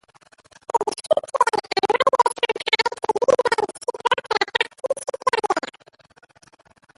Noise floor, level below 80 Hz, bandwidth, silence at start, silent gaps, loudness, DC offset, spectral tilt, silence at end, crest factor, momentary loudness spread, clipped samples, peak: -54 dBFS; -64 dBFS; 11.5 kHz; 0.75 s; none; -21 LUFS; under 0.1%; -1.5 dB/octave; 1.4 s; 20 dB; 8 LU; under 0.1%; -4 dBFS